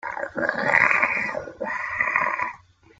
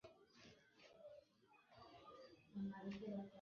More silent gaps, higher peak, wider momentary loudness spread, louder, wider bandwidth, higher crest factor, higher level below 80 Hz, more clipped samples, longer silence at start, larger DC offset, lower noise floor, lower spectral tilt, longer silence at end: neither; first, -2 dBFS vs -40 dBFS; second, 13 LU vs 17 LU; first, -22 LUFS vs -55 LUFS; first, 9.2 kHz vs 6.8 kHz; first, 22 dB vs 16 dB; first, -62 dBFS vs -82 dBFS; neither; about the same, 0.05 s vs 0.05 s; neither; second, -45 dBFS vs -75 dBFS; second, -4.5 dB/octave vs -6.5 dB/octave; first, 0.45 s vs 0 s